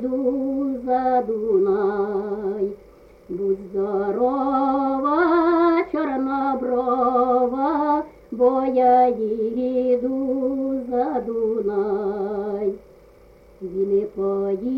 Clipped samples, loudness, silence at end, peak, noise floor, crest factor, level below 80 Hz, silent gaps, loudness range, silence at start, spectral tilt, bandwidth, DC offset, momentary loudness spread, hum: under 0.1%; -21 LUFS; 0 s; -6 dBFS; -49 dBFS; 14 dB; -54 dBFS; none; 5 LU; 0 s; -9 dB/octave; 5.6 kHz; under 0.1%; 8 LU; none